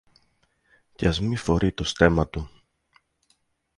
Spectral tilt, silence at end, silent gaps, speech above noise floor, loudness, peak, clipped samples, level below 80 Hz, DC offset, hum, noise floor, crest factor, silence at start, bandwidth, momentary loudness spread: -6 dB/octave; 1.3 s; none; 46 dB; -24 LUFS; -4 dBFS; under 0.1%; -38 dBFS; under 0.1%; none; -69 dBFS; 24 dB; 1 s; 11.5 kHz; 12 LU